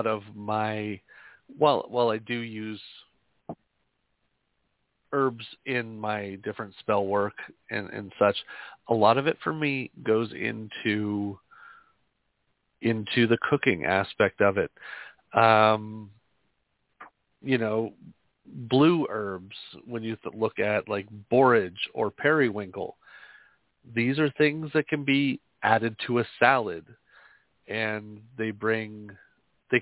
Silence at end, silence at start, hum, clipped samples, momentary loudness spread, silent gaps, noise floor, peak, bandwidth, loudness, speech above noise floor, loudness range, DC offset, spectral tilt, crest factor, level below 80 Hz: 0 s; 0 s; none; under 0.1%; 18 LU; none; -76 dBFS; -4 dBFS; 4 kHz; -26 LUFS; 49 dB; 7 LU; under 0.1%; -9.5 dB/octave; 24 dB; -64 dBFS